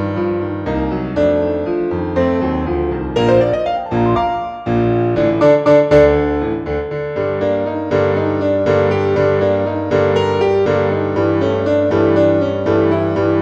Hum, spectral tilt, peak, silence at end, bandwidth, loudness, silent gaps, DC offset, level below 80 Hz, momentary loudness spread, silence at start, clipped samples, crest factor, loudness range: none; -8 dB/octave; 0 dBFS; 0 s; 7.8 kHz; -15 LUFS; none; under 0.1%; -36 dBFS; 7 LU; 0 s; under 0.1%; 14 dB; 3 LU